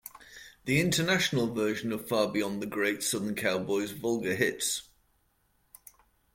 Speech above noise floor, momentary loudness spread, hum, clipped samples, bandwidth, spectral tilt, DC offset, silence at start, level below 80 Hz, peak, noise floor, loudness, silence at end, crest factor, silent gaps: 42 dB; 8 LU; none; under 0.1%; 16.5 kHz; -4 dB/octave; under 0.1%; 0.05 s; -64 dBFS; -12 dBFS; -71 dBFS; -29 LUFS; 1.5 s; 20 dB; none